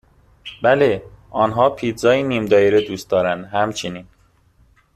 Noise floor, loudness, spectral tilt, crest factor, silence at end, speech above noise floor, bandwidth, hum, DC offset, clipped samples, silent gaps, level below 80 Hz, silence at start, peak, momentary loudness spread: -55 dBFS; -18 LUFS; -5.5 dB/octave; 18 dB; 0.95 s; 38 dB; 14 kHz; none; under 0.1%; under 0.1%; none; -52 dBFS; 0.45 s; -2 dBFS; 14 LU